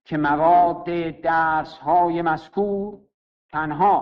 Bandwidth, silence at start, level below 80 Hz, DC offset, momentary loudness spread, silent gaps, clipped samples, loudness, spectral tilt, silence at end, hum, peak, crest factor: 5.8 kHz; 0.1 s; -52 dBFS; under 0.1%; 11 LU; 3.14-3.49 s; under 0.1%; -21 LUFS; -8.5 dB/octave; 0 s; none; -8 dBFS; 14 dB